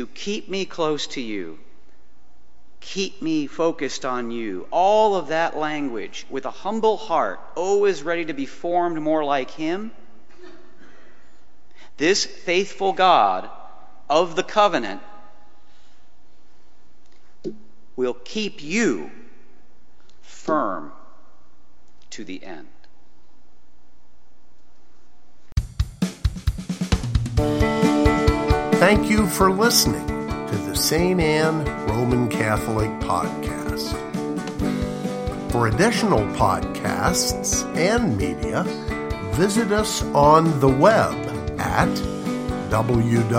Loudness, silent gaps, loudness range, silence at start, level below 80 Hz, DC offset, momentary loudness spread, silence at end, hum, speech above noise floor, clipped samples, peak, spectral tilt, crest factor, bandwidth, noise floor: -21 LUFS; none; 13 LU; 0 s; -36 dBFS; under 0.1%; 13 LU; 0 s; none; 39 dB; under 0.1%; 0 dBFS; -5 dB/octave; 22 dB; 16 kHz; -59 dBFS